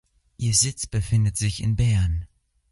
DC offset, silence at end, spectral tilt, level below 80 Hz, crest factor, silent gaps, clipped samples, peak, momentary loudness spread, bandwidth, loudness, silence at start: under 0.1%; 0.45 s; -4 dB/octave; -34 dBFS; 16 dB; none; under 0.1%; -8 dBFS; 8 LU; 11.5 kHz; -23 LUFS; 0.4 s